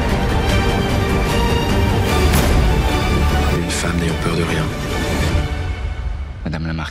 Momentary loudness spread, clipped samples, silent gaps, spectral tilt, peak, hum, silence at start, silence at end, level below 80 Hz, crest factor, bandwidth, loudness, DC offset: 9 LU; under 0.1%; none; -5.5 dB/octave; -2 dBFS; none; 0 s; 0 s; -22 dBFS; 14 dB; 16 kHz; -18 LUFS; under 0.1%